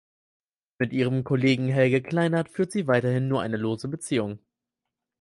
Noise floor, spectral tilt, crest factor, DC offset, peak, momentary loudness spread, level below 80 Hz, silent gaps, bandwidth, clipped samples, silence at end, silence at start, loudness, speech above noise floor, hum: -86 dBFS; -6.5 dB/octave; 18 dB; under 0.1%; -8 dBFS; 8 LU; -62 dBFS; none; 11.5 kHz; under 0.1%; 0.85 s; 0.8 s; -25 LUFS; 62 dB; none